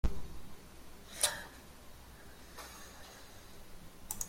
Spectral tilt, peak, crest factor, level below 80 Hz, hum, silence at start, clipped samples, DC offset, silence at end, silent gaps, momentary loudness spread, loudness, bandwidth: -2 dB/octave; -12 dBFS; 28 dB; -48 dBFS; none; 0.05 s; under 0.1%; under 0.1%; 0 s; none; 22 LU; -40 LUFS; 16.5 kHz